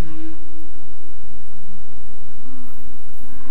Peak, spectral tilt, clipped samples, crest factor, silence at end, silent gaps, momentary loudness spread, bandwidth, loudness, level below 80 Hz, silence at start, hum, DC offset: -6 dBFS; -7.5 dB/octave; under 0.1%; 14 dB; 0 s; none; 8 LU; 16 kHz; -43 LUFS; -46 dBFS; 0 s; none; 50%